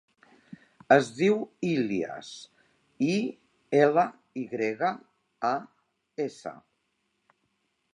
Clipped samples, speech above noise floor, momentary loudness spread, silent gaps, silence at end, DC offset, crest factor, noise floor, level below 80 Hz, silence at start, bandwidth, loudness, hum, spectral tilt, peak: under 0.1%; 50 dB; 19 LU; none; 1.4 s; under 0.1%; 24 dB; -76 dBFS; -78 dBFS; 0.5 s; 10.5 kHz; -27 LUFS; none; -6 dB/octave; -4 dBFS